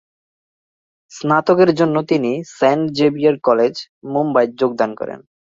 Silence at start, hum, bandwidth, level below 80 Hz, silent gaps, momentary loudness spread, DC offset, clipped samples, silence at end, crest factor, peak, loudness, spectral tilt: 1.1 s; none; 7.8 kHz; -60 dBFS; 3.89-4.01 s; 12 LU; under 0.1%; under 0.1%; 0.4 s; 16 dB; -2 dBFS; -16 LUFS; -6.5 dB/octave